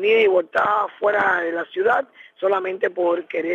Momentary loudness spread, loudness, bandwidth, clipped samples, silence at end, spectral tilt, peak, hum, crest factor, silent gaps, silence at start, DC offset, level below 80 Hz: 7 LU; -20 LUFS; 7 kHz; under 0.1%; 0 s; -5.5 dB/octave; -6 dBFS; none; 14 dB; none; 0 s; under 0.1%; -70 dBFS